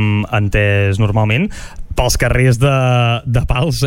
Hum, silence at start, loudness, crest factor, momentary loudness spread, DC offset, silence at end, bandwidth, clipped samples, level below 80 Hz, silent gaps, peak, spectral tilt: none; 0 s; -14 LUFS; 12 dB; 6 LU; under 0.1%; 0 s; 16.5 kHz; under 0.1%; -24 dBFS; none; -2 dBFS; -5.5 dB/octave